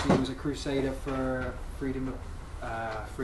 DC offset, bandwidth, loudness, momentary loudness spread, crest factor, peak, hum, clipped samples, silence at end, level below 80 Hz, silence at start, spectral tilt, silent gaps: under 0.1%; 12.5 kHz; -33 LUFS; 10 LU; 20 dB; -12 dBFS; none; under 0.1%; 0 s; -42 dBFS; 0 s; -6.5 dB/octave; none